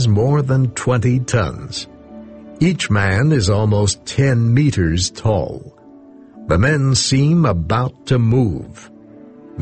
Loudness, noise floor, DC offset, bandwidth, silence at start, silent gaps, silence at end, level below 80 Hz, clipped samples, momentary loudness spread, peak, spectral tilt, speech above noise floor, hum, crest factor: -16 LUFS; -42 dBFS; under 0.1%; 8.8 kHz; 0 s; none; 0 s; -36 dBFS; under 0.1%; 15 LU; -2 dBFS; -5.5 dB/octave; 26 dB; none; 14 dB